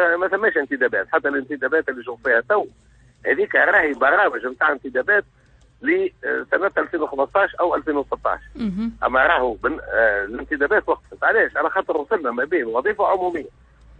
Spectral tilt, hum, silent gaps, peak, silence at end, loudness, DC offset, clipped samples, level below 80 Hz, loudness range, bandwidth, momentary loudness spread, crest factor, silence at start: -6.5 dB/octave; none; none; -2 dBFS; 0.5 s; -20 LUFS; under 0.1%; under 0.1%; -50 dBFS; 3 LU; 7.8 kHz; 9 LU; 18 dB; 0 s